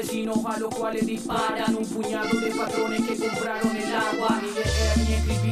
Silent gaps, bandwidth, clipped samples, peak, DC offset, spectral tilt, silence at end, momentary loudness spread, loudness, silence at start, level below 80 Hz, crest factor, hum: none; 15.5 kHz; under 0.1%; -10 dBFS; under 0.1%; -5 dB/octave; 0 s; 4 LU; -25 LUFS; 0 s; -34 dBFS; 16 dB; none